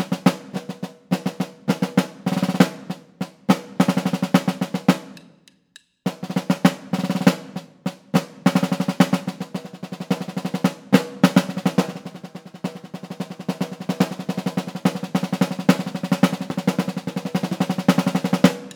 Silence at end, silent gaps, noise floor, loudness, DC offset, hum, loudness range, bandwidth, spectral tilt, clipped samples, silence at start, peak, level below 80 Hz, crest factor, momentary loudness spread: 0 s; none; -54 dBFS; -22 LUFS; under 0.1%; none; 3 LU; over 20 kHz; -6 dB/octave; under 0.1%; 0 s; 0 dBFS; -64 dBFS; 22 dB; 13 LU